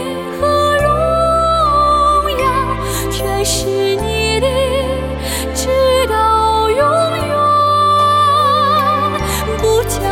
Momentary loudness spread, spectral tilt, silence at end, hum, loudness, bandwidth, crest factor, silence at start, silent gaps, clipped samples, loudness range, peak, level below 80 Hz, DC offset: 7 LU; -4 dB/octave; 0 s; none; -13 LUFS; 17 kHz; 12 dB; 0 s; none; under 0.1%; 4 LU; -2 dBFS; -28 dBFS; under 0.1%